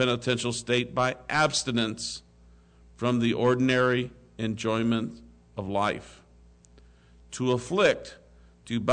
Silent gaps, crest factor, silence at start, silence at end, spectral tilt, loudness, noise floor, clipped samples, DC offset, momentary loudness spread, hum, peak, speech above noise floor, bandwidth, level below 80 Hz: none; 16 dB; 0 s; 0 s; -4.5 dB/octave; -27 LUFS; -56 dBFS; under 0.1%; under 0.1%; 14 LU; 60 Hz at -55 dBFS; -12 dBFS; 29 dB; 9.4 kHz; -56 dBFS